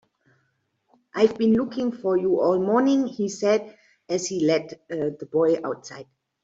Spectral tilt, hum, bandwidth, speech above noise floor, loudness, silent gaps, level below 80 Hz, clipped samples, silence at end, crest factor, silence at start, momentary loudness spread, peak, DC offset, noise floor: -5.5 dB/octave; none; 8 kHz; 49 dB; -23 LUFS; none; -66 dBFS; under 0.1%; 0.4 s; 18 dB; 1.15 s; 12 LU; -6 dBFS; under 0.1%; -72 dBFS